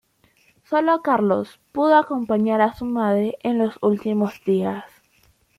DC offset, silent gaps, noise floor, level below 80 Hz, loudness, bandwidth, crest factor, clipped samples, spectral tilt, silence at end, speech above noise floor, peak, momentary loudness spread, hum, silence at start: under 0.1%; none; -60 dBFS; -60 dBFS; -21 LUFS; 13.5 kHz; 18 dB; under 0.1%; -8 dB/octave; 0.7 s; 40 dB; -2 dBFS; 7 LU; none; 0.7 s